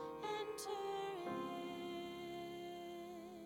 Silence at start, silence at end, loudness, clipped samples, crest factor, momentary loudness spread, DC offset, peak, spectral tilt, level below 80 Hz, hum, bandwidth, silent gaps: 0 s; 0 s; -46 LUFS; under 0.1%; 14 dB; 6 LU; under 0.1%; -32 dBFS; -4 dB/octave; -78 dBFS; none; 18.5 kHz; none